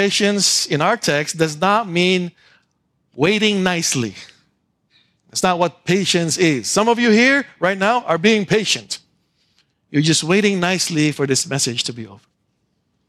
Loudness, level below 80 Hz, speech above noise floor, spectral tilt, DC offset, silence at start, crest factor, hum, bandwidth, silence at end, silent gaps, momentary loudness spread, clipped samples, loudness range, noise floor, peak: -17 LUFS; -60 dBFS; 50 dB; -3.5 dB/octave; under 0.1%; 0 s; 16 dB; none; 15 kHz; 0.95 s; none; 8 LU; under 0.1%; 4 LU; -68 dBFS; -2 dBFS